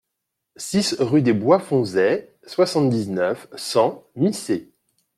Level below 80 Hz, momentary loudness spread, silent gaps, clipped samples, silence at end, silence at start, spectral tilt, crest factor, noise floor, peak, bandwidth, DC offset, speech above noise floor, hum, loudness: -64 dBFS; 9 LU; none; under 0.1%; 0.55 s; 0.6 s; -5.5 dB/octave; 18 dB; -80 dBFS; -2 dBFS; 15.5 kHz; under 0.1%; 60 dB; none; -21 LUFS